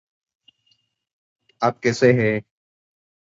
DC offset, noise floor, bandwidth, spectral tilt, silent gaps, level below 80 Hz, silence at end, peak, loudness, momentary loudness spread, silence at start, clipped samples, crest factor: under 0.1%; -66 dBFS; 7.8 kHz; -6.5 dB/octave; none; -62 dBFS; 0.85 s; -4 dBFS; -20 LUFS; 7 LU; 1.6 s; under 0.1%; 20 dB